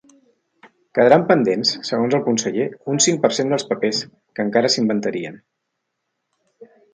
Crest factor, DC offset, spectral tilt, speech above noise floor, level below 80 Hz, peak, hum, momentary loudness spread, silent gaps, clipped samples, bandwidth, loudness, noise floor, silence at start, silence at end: 20 dB; under 0.1%; -3.5 dB/octave; 58 dB; -68 dBFS; 0 dBFS; none; 11 LU; none; under 0.1%; 10 kHz; -18 LUFS; -77 dBFS; 0.95 s; 0.3 s